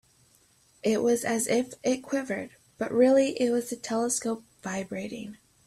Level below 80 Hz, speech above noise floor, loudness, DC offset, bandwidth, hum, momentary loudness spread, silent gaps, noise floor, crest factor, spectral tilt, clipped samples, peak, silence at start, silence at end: -68 dBFS; 36 dB; -28 LUFS; under 0.1%; 14.5 kHz; none; 14 LU; none; -63 dBFS; 18 dB; -4 dB/octave; under 0.1%; -10 dBFS; 0.85 s; 0.3 s